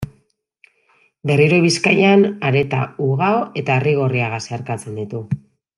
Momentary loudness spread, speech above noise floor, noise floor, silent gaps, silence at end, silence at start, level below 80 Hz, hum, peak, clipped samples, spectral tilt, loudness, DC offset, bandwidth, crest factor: 14 LU; 45 dB; -62 dBFS; none; 0.4 s; 0 s; -54 dBFS; none; -2 dBFS; under 0.1%; -6 dB/octave; -17 LUFS; under 0.1%; 11.5 kHz; 16 dB